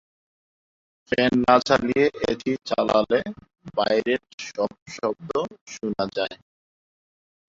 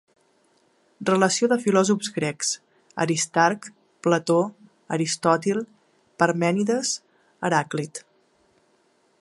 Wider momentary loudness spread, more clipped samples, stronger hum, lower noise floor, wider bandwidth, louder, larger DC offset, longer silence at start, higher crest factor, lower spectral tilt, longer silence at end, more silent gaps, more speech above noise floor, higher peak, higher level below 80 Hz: about the same, 13 LU vs 11 LU; neither; neither; first, under -90 dBFS vs -64 dBFS; second, 7.8 kHz vs 11.5 kHz; about the same, -23 LUFS vs -23 LUFS; neither; about the same, 1.1 s vs 1 s; about the same, 22 dB vs 22 dB; about the same, -5 dB/octave vs -4 dB/octave; about the same, 1.2 s vs 1.2 s; first, 4.34-4.38 s, 4.82-4.86 s, 5.61-5.66 s vs none; first, over 67 dB vs 42 dB; about the same, -2 dBFS vs -2 dBFS; first, -56 dBFS vs -72 dBFS